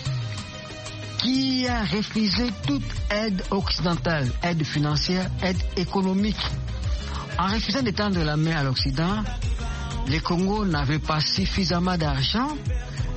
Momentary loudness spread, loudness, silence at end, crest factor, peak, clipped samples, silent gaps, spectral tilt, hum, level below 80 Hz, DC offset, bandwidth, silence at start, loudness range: 7 LU; -25 LUFS; 0 s; 20 dB; -4 dBFS; under 0.1%; none; -5.5 dB/octave; none; -34 dBFS; under 0.1%; 8.4 kHz; 0 s; 1 LU